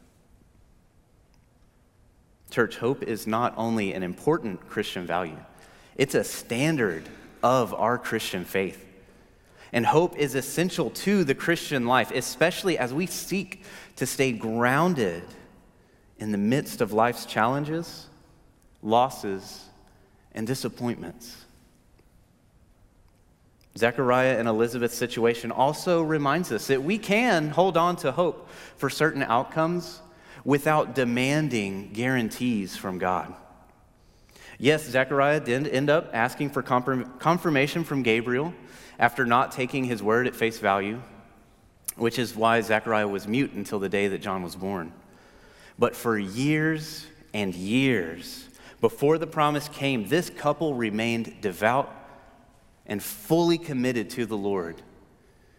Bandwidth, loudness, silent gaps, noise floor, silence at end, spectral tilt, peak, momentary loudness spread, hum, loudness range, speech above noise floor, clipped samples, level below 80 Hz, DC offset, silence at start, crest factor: 16.5 kHz; -26 LUFS; none; -60 dBFS; 0.75 s; -5 dB/octave; -4 dBFS; 12 LU; none; 5 LU; 35 dB; under 0.1%; -60 dBFS; under 0.1%; 2.5 s; 22 dB